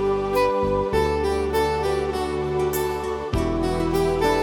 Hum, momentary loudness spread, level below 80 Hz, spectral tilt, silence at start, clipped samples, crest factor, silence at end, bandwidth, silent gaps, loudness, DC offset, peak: none; 4 LU; -34 dBFS; -6 dB/octave; 0 s; under 0.1%; 14 dB; 0 s; 18 kHz; none; -23 LUFS; under 0.1%; -8 dBFS